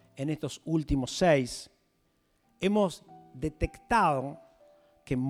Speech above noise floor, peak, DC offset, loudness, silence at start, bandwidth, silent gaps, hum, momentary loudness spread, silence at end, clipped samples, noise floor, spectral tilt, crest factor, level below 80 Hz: 43 dB; -12 dBFS; under 0.1%; -29 LUFS; 0.15 s; 16 kHz; none; none; 12 LU; 0 s; under 0.1%; -72 dBFS; -5.5 dB/octave; 18 dB; -46 dBFS